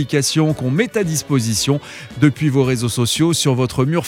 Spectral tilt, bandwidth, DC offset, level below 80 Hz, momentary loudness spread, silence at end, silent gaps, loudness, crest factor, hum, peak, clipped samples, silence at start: -5 dB/octave; 17 kHz; under 0.1%; -48 dBFS; 4 LU; 0 s; none; -17 LUFS; 16 dB; none; 0 dBFS; under 0.1%; 0 s